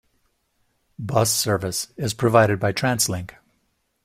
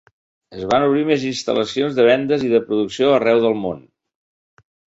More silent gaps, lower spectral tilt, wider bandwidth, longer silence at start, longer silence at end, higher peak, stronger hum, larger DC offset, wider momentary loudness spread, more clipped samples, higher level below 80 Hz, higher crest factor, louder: neither; second, -4 dB/octave vs -5.5 dB/octave; first, 16 kHz vs 8 kHz; first, 1 s vs 0.5 s; second, 0.75 s vs 1.15 s; about the same, -2 dBFS vs -2 dBFS; neither; neither; about the same, 12 LU vs 11 LU; neither; about the same, -54 dBFS vs -56 dBFS; first, 22 dB vs 16 dB; second, -21 LUFS vs -17 LUFS